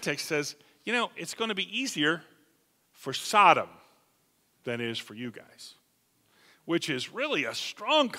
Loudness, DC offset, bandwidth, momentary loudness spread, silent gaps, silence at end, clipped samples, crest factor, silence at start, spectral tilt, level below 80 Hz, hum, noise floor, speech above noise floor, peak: -28 LUFS; under 0.1%; 16 kHz; 21 LU; none; 0 s; under 0.1%; 26 dB; 0 s; -3 dB/octave; -80 dBFS; none; -70 dBFS; 41 dB; -4 dBFS